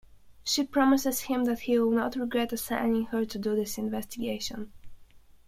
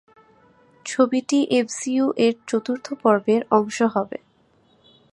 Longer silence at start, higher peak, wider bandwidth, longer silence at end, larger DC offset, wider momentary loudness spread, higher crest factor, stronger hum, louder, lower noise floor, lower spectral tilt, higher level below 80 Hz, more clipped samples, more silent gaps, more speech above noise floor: second, 0.15 s vs 0.85 s; second, -10 dBFS vs -2 dBFS; first, 16.5 kHz vs 11.5 kHz; second, 0.3 s vs 0.95 s; neither; about the same, 10 LU vs 10 LU; about the same, 18 dB vs 20 dB; neither; second, -28 LUFS vs -21 LUFS; second, -53 dBFS vs -60 dBFS; about the same, -3.5 dB/octave vs -4.5 dB/octave; first, -56 dBFS vs -70 dBFS; neither; neither; second, 26 dB vs 39 dB